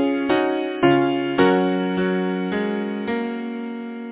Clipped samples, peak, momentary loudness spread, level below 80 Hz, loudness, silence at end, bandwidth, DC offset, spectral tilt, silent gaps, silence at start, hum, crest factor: under 0.1%; -2 dBFS; 11 LU; -58 dBFS; -21 LUFS; 0 s; 4 kHz; under 0.1%; -10.5 dB/octave; none; 0 s; none; 18 dB